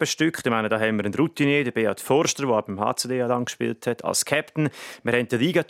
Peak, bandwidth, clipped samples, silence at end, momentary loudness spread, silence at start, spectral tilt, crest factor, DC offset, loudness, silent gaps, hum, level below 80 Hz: -4 dBFS; 16.5 kHz; under 0.1%; 0.05 s; 6 LU; 0 s; -4 dB/octave; 20 dB; under 0.1%; -23 LUFS; none; none; -68 dBFS